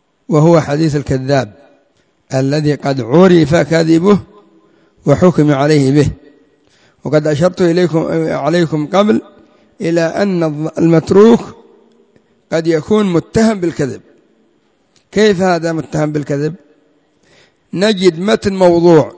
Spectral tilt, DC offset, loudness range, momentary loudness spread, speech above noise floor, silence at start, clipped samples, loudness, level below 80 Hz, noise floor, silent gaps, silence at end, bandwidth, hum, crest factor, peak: -7 dB/octave; under 0.1%; 5 LU; 9 LU; 45 dB; 0.3 s; 0.2%; -12 LUFS; -42 dBFS; -57 dBFS; none; 0.05 s; 8 kHz; none; 12 dB; 0 dBFS